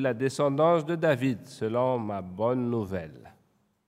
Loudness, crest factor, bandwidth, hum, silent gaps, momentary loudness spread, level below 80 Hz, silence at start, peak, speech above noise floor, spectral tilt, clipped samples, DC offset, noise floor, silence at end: -27 LUFS; 18 dB; 15 kHz; none; none; 11 LU; -66 dBFS; 0 s; -10 dBFS; 41 dB; -7 dB/octave; under 0.1%; under 0.1%; -69 dBFS; 0.6 s